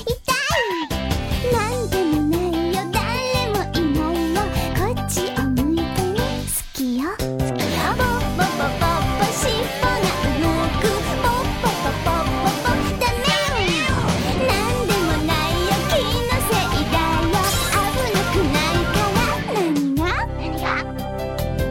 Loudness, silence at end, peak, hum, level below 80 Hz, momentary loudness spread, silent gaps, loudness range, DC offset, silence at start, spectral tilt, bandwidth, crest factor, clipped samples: -20 LUFS; 0 s; -6 dBFS; none; -30 dBFS; 4 LU; none; 2 LU; under 0.1%; 0 s; -4.5 dB/octave; 17.5 kHz; 14 dB; under 0.1%